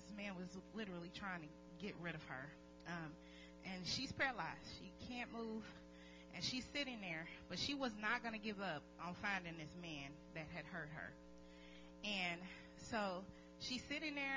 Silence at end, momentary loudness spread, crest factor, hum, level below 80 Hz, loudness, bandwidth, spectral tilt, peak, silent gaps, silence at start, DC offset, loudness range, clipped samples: 0 s; 15 LU; 22 dB; none; -68 dBFS; -47 LUFS; 7.6 kHz; -4 dB/octave; -26 dBFS; none; 0 s; under 0.1%; 5 LU; under 0.1%